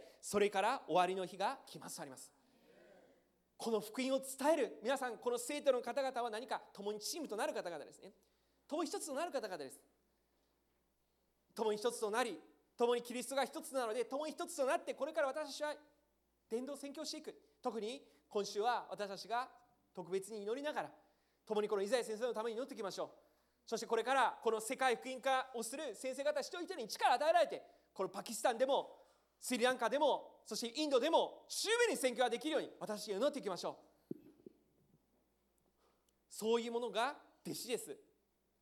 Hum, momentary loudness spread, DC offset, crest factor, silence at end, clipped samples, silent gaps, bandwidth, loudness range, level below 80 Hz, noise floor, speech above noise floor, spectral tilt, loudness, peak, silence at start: none; 14 LU; under 0.1%; 20 dB; 0.65 s; under 0.1%; none; 18 kHz; 8 LU; -86 dBFS; -81 dBFS; 42 dB; -2.5 dB/octave; -39 LUFS; -20 dBFS; 0 s